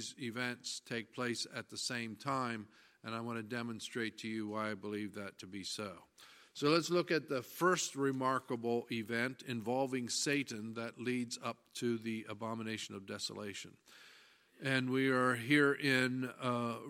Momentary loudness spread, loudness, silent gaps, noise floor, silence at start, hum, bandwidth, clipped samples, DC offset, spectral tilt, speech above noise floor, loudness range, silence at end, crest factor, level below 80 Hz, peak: 13 LU; -37 LUFS; none; -64 dBFS; 0 s; none; 16 kHz; under 0.1%; under 0.1%; -4 dB/octave; 27 dB; 7 LU; 0 s; 20 dB; -82 dBFS; -18 dBFS